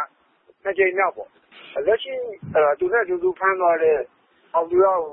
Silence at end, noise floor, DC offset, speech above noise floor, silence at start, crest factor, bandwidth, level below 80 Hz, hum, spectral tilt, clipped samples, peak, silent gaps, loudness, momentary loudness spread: 0 s; -59 dBFS; under 0.1%; 38 dB; 0 s; 16 dB; 3.9 kHz; -62 dBFS; none; -9.5 dB/octave; under 0.1%; -6 dBFS; none; -21 LUFS; 14 LU